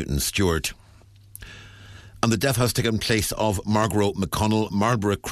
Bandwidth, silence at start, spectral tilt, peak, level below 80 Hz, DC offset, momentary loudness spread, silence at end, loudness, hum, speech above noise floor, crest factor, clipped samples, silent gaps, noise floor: 14 kHz; 0 s; -4.5 dB/octave; -4 dBFS; -40 dBFS; under 0.1%; 18 LU; 0 s; -23 LUFS; none; 28 dB; 20 dB; under 0.1%; none; -51 dBFS